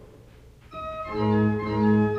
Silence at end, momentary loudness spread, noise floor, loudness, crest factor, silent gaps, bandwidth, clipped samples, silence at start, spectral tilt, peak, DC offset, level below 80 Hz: 0 s; 15 LU; -50 dBFS; -25 LUFS; 14 dB; none; 5.6 kHz; under 0.1%; 0 s; -9.5 dB/octave; -10 dBFS; under 0.1%; -48 dBFS